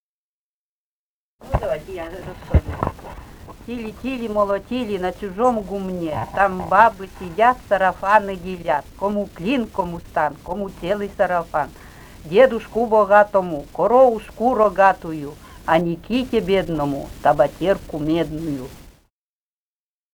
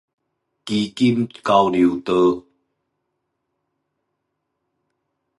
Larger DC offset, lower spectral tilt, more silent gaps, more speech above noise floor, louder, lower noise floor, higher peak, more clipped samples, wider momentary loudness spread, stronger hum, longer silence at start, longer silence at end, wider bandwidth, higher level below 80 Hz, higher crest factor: neither; about the same, -6.5 dB/octave vs -6.5 dB/octave; neither; first, over 70 dB vs 59 dB; about the same, -20 LUFS vs -19 LUFS; first, under -90 dBFS vs -76 dBFS; about the same, 0 dBFS vs -2 dBFS; neither; first, 16 LU vs 9 LU; neither; first, 1.45 s vs 0.65 s; second, 1.25 s vs 3 s; first, over 20 kHz vs 11.5 kHz; first, -38 dBFS vs -58 dBFS; about the same, 20 dB vs 20 dB